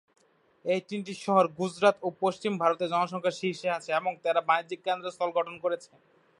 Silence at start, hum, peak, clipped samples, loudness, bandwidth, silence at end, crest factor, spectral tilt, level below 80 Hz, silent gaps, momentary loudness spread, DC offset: 0.65 s; none; -8 dBFS; under 0.1%; -29 LUFS; 11.5 kHz; 0.55 s; 20 dB; -5 dB/octave; -80 dBFS; none; 7 LU; under 0.1%